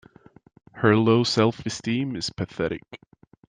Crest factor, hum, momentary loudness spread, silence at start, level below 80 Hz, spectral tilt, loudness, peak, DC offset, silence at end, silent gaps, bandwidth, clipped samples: 20 dB; none; 11 LU; 0.75 s; -58 dBFS; -5.5 dB/octave; -23 LUFS; -4 dBFS; under 0.1%; 0.5 s; none; 9.8 kHz; under 0.1%